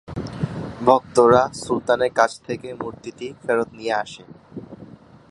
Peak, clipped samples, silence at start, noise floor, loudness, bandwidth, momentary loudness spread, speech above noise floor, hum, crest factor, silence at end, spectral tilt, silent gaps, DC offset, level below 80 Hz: 0 dBFS; under 0.1%; 0.1 s; -44 dBFS; -21 LUFS; 11.5 kHz; 23 LU; 24 dB; none; 22 dB; 0.45 s; -5.5 dB/octave; none; under 0.1%; -50 dBFS